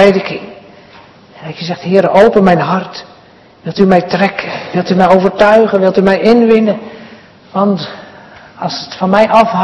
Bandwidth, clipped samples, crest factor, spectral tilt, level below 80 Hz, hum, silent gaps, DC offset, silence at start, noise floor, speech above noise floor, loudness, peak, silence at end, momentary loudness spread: 9 kHz; 2%; 12 dB; -7 dB/octave; -46 dBFS; none; none; under 0.1%; 0 s; -41 dBFS; 31 dB; -10 LUFS; 0 dBFS; 0 s; 18 LU